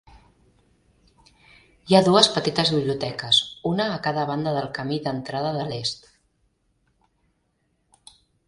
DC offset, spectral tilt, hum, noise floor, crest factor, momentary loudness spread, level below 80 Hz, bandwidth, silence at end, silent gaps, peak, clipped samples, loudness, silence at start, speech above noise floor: under 0.1%; -4.5 dB/octave; none; -70 dBFS; 24 dB; 11 LU; -58 dBFS; 11.5 kHz; 2.5 s; none; 0 dBFS; under 0.1%; -22 LUFS; 1.85 s; 48 dB